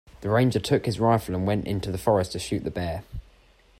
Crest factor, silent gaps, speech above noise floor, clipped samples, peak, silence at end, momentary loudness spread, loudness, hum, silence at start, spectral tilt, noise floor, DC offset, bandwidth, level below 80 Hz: 18 dB; none; 33 dB; under 0.1%; -8 dBFS; 0.6 s; 10 LU; -25 LUFS; none; 0.2 s; -6.5 dB/octave; -57 dBFS; under 0.1%; 16 kHz; -48 dBFS